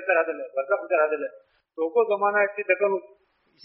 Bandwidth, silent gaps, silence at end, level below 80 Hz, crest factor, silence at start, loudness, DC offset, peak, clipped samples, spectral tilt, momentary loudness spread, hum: 3.9 kHz; none; 0.6 s; -82 dBFS; 18 dB; 0 s; -24 LUFS; under 0.1%; -6 dBFS; under 0.1%; -2.5 dB/octave; 9 LU; none